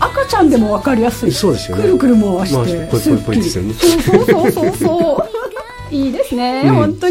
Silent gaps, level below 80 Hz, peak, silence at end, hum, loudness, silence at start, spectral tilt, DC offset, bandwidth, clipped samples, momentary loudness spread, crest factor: none; -34 dBFS; 0 dBFS; 0 s; none; -14 LUFS; 0 s; -6 dB/octave; under 0.1%; 16.5 kHz; under 0.1%; 7 LU; 14 dB